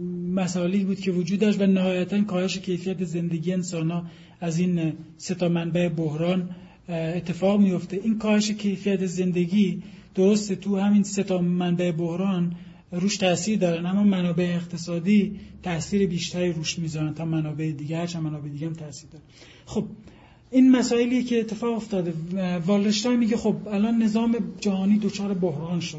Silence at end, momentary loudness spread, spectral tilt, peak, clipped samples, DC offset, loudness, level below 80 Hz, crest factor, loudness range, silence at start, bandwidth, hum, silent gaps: 0 s; 10 LU; -6 dB/octave; -8 dBFS; under 0.1%; under 0.1%; -24 LUFS; -56 dBFS; 16 dB; 4 LU; 0 s; 8 kHz; none; none